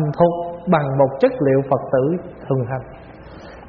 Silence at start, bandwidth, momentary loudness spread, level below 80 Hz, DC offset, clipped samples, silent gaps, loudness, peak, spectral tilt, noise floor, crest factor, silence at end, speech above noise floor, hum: 0 s; 5.2 kHz; 22 LU; -48 dBFS; under 0.1%; under 0.1%; none; -19 LUFS; -2 dBFS; -8 dB/octave; -38 dBFS; 18 dB; 0 s; 20 dB; none